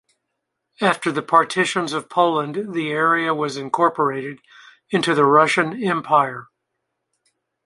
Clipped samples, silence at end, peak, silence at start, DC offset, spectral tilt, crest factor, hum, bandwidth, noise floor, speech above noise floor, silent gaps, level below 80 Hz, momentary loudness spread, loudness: under 0.1%; 1.2 s; -2 dBFS; 0.8 s; under 0.1%; -4.5 dB/octave; 20 dB; none; 11.5 kHz; -78 dBFS; 59 dB; none; -68 dBFS; 10 LU; -19 LUFS